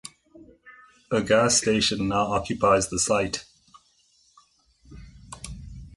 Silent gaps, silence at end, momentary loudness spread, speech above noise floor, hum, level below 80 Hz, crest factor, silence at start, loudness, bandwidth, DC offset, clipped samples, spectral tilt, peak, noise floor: none; 0 s; 21 LU; 40 dB; none; -48 dBFS; 18 dB; 0.05 s; -23 LUFS; 11.5 kHz; under 0.1%; under 0.1%; -3 dB/octave; -8 dBFS; -63 dBFS